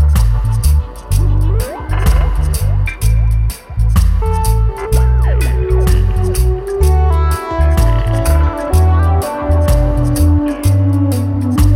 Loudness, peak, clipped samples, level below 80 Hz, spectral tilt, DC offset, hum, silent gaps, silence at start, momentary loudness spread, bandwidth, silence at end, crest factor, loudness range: -14 LUFS; 0 dBFS; under 0.1%; -14 dBFS; -7 dB/octave; under 0.1%; none; none; 0 s; 4 LU; 16 kHz; 0 s; 12 dB; 2 LU